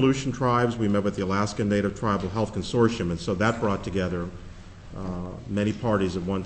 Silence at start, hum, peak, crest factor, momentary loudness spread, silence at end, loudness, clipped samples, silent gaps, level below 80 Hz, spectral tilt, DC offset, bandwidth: 0 s; none; -6 dBFS; 18 dB; 12 LU; 0 s; -26 LUFS; under 0.1%; none; -44 dBFS; -6.5 dB/octave; under 0.1%; 8.6 kHz